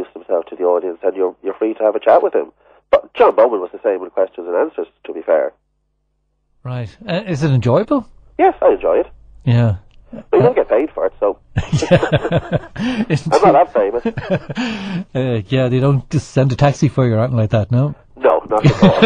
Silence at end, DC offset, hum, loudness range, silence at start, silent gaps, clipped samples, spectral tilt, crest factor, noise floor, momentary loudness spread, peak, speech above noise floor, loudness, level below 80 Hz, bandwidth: 0 s; under 0.1%; none; 4 LU; 0 s; none; under 0.1%; -7.5 dB/octave; 16 dB; -66 dBFS; 10 LU; 0 dBFS; 51 dB; -16 LUFS; -42 dBFS; 9.8 kHz